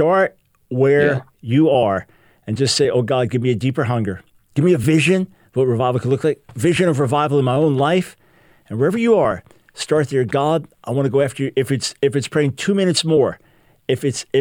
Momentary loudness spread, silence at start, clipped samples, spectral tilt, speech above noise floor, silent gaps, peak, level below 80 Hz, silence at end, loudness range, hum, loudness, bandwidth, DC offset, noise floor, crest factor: 10 LU; 0 s; under 0.1%; -6 dB/octave; 36 dB; none; -2 dBFS; -54 dBFS; 0 s; 2 LU; none; -18 LUFS; 19 kHz; under 0.1%; -53 dBFS; 14 dB